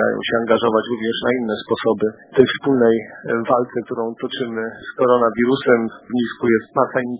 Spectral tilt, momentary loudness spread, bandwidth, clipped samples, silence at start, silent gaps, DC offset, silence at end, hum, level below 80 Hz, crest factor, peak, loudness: -10 dB/octave; 9 LU; 4 kHz; under 0.1%; 0 s; none; under 0.1%; 0 s; none; -56 dBFS; 18 dB; 0 dBFS; -19 LUFS